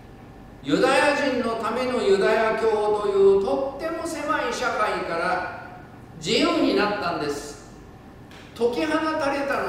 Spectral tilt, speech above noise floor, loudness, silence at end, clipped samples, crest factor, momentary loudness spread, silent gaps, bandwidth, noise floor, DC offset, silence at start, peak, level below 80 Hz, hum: -4.5 dB/octave; 22 dB; -23 LUFS; 0 s; under 0.1%; 18 dB; 15 LU; none; 14.5 kHz; -44 dBFS; under 0.1%; 0 s; -6 dBFS; -52 dBFS; none